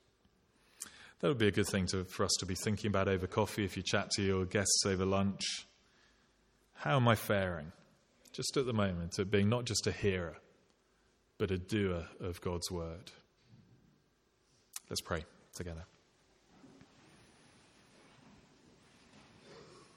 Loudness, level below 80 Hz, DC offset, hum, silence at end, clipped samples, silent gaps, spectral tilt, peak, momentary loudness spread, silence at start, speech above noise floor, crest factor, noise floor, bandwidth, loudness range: -35 LUFS; -62 dBFS; under 0.1%; none; 0.15 s; under 0.1%; none; -4.5 dB/octave; -12 dBFS; 18 LU; 0.8 s; 39 dB; 24 dB; -74 dBFS; 16.5 kHz; 13 LU